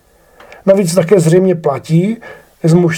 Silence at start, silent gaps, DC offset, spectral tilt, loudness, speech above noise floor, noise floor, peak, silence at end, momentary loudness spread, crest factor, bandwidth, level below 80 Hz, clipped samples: 0.65 s; none; under 0.1%; -7 dB/octave; -12 LUFS; 33 dB; -43 dBFS; 0 dBFS; 0 s; 9 LU; 12 dB; 15.5 kHz; -52 dBFS; 0.1%